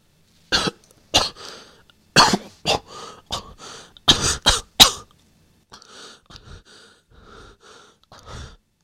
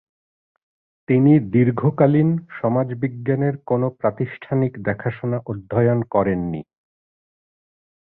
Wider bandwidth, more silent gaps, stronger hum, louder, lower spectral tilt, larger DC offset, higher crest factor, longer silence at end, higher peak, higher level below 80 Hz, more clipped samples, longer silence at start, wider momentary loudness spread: first, 16.5 kHz vs 4 kHz; neither; neither; about the same, -18 LUFS vs -20 LUFS; second, -1.5 dB/octave vs -13.5 dB/octave; neither; first, 24 dB vs 18 dB; second, 0.35 s vs 1.4 s; about the same, 0 dBFS vs -2 dBFS; first, -40 dBFS vs -52 dBFS; neither; second, 0.5 s vs 1.1 s; first, 27 LU vs 10 LU